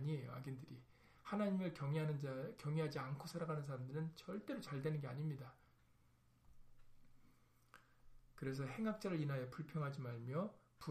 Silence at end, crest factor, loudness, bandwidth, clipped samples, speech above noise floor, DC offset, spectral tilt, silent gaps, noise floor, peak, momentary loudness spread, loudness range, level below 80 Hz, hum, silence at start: 0 s; 16 dB; -46 LUFS; 14.5 kHz; under 0.1%; 29 dB; under 0.1%; -7.5 dB/octave; none; -73 dBFS; -30 dBFS; 9 LU; 10 LU; -74 dBFS; none; 0 s